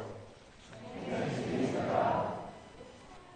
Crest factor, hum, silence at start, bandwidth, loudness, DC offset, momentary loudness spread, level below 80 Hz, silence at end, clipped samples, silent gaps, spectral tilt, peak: 20 dB; none; 0 s; 9.6 kHz; -34 LUFS; under 0.1%; 22 LU; -62 dBFS; 0 s; under 0.1%; none; -6.5 dB/octave; -16 dBFS